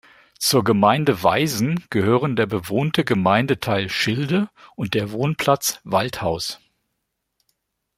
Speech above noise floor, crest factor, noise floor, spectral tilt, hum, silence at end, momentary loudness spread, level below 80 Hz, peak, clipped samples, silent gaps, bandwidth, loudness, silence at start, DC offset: 57 dB; 20 dB; -77 dBFS; -5 dB/octave; none; 1.4 s; 7 LU; -56 dBFS; -2 dBFS; under 0.1%; none; 16 kHz; -20 LUFS; 0.4 s; under 0.1%